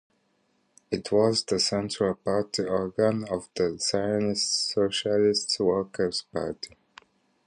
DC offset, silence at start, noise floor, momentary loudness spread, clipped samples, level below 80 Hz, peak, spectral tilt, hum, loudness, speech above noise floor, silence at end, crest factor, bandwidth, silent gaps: under 0.1%; 0.9 s; -70 dBFS; 10 LU; under 0.1%; -58 dBFS; -10 dBFS; -4 dB/octave; none; -26 LUFS; 44 dB; 0.8 s; 18 dB; 10.5 kHz; none